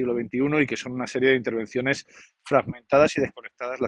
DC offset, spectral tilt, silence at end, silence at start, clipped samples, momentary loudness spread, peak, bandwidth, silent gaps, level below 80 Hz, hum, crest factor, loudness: under 0.1%; -5.5 dB/octave; 0 s; 0 s; under 0.1%; 10 LU; -6 dBFS; 10.5 kHz; none; -60 dBFS; none; 18 dB; -24 LUFS